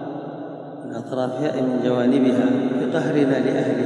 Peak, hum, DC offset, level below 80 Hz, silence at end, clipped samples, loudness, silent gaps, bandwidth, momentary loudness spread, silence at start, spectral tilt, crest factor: -6 dBFS; none; under 0.1%; -78 dBFS; 0 s; under 0.1%; -21 LUFS; none; 10.5 kHz; 15 LU; 0 s; -7.5 dB/octave; 14 dB